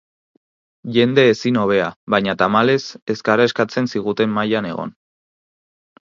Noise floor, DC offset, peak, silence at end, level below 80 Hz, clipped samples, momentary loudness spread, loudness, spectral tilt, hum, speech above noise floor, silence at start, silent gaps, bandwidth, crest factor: under -90 dBFS; under 0.1%; 0 dBFS; 1.2 s; -58 dBFS; under 0.1%; 10 LU; -18 LUFS; -6 dB/octave; none; over 73 dB; 0.85 s; 1.96-2.07 s, 3.02-3.07 s; 7.4 kHz; 18 dB